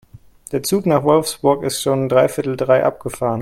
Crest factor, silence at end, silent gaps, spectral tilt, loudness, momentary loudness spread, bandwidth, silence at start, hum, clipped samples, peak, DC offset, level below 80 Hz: 16 dB; 0 s; none; -5 dB/octave; -17 LUFS; 7 LU; 16.5 kHz; 0.5 s; none; under 0.1%; 0 dBFS; under 0.1%; -52 dBFS